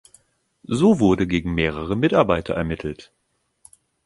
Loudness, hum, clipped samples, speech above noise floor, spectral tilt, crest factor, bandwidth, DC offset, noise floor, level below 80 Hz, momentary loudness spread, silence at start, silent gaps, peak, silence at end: -20 LUFS; none; under 0.1%; 38 dB; -7 dB/octave; 20 dB; 11.5 kHz; under 0.1%; -58 dBFS; -42 dBFS; 12 LU; 0.7 s; none; -2 dBFS; 1 s